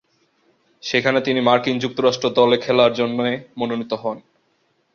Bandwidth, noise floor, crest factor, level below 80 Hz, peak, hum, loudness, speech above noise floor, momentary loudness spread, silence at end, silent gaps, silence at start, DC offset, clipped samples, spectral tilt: 7 kHz; -65 dBFS; 20 dB; -62 dBFS; -2 dBFS; none; -19 LUFS; 46 dB; 10 LU; 0.75 s; none; 0.85 s; under 0.1%; under 0.1%; -5 dB/octave